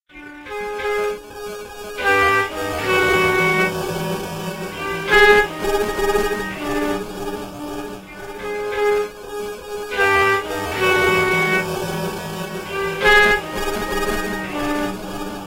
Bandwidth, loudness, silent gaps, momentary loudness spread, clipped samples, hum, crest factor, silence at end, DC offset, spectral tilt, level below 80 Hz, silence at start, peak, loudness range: 16 kHz; -19 LUFS; none; 15 LU; under 0.1%; none; 20 dB; 0 s; under 0.1%; -4 dB/octave; -38 dBFS; 0.15 s; 0 dBFS; 6 LU